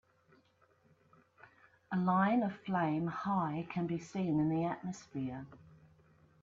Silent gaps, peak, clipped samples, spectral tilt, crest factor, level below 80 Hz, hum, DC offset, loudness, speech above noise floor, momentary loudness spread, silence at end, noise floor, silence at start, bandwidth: none; -20 dBFS; under 0.1%; -8 dB/octave; 18 dB; -72 dBFS; none; under 0.1%; -35 LUFS; 36 dB; 12 LU; 0.8 s; -70 dBFS; 1.9 s; 7.6 kHz